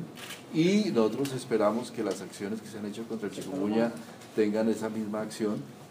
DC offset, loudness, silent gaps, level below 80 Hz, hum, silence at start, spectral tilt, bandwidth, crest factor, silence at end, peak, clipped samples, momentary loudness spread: under 0.1%; -30 LUFS; none; -80 dBFS; none; 0 s; -6 dB/octave; 15.5 kHz; 18 dB; 0 s; -12 dBFS; under 0.1%; 12 LU